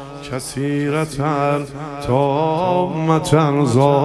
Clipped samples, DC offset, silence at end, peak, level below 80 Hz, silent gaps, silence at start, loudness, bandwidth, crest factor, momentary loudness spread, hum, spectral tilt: under 0.1%; under 0.1%; 0 s; 0 dBFS; -46 dBFS; none; 0 s; -18 LUFS; 13 kHz; 18 dB; 11 LU; none; -6.5 dB/octave